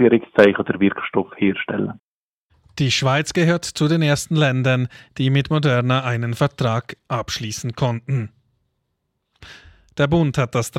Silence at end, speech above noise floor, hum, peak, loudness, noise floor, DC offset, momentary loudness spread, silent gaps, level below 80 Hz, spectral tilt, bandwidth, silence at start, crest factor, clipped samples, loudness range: 0 s; 55 dB; none; 0 dBFS; -20 LUFS; -74 dBFS; under 0.1%; 10 LU; 1.99-2.50 s; -50 dBFS; -6 dB/octave; 14.5 kHz; 0 s; 20 dB; under 0.1%; 6 LU